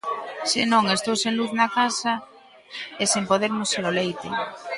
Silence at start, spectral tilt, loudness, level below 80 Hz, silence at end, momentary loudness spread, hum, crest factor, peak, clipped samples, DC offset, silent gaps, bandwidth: 0.05 s; -2.5 dB/octave; -23 LUFS; -66 dBFS; 0 s; 11 LU; none; 18 dB; -6 dBFS; under 0.1%; under 0.1%; none; 11.5 kHz